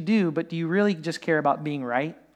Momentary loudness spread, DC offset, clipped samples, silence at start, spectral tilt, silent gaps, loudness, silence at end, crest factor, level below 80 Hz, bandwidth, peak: 5 LU; under 0.1%; under 0.1%; 0 s; -7 dB/octave; none; -25 LUFS; 0.2 s; 14 dB; -76 dBFS; 10 kHz; -10 dBFS